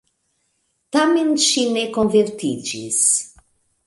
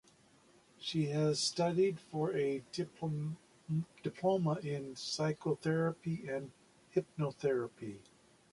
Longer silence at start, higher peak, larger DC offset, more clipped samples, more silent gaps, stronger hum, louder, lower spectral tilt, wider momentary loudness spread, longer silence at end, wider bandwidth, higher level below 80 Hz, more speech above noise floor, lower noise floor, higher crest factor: first, 0.95 s vs 0.8 s; first, -4 dBFS vs -20 dBFS; neither; neither; neither; neither; first, -18 LUFS vs -36 LUFS; second, -2.5 dB/octave vs -5.5 dB/octave; about the same, 9 LU vs 11 LU; about the same, 0.6 s vs 0.5 s; about the same, 11.5 kHz vs 11.5 kHz; first, -60 dBFS vs -74 dBFS; first, 51 dB vs 30 dB; about the same, -69 dBFS vs -66 dBFS; about the same, 16 dB vs 18 dB